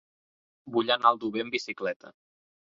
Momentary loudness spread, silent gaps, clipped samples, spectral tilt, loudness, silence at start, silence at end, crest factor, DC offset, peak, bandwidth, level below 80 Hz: 11 LU; 1.96-2.00 s; under 0.1%; -4 dB/octave; -27 LUFS; 0.65 s; 0.6 s; 24 dB; under 0.1%; -6 dBFS; 7.6 kHz; -74 dBFS